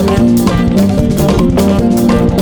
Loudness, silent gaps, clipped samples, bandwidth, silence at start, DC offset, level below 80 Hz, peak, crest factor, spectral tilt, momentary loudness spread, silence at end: -10 LUFS; none; under 0.1%; over 20 kHz; 0 s; under 0.1%; -22 dBFS; 0 dBFS; 10 dB; -7 dB/octave; 1 LU; 0 s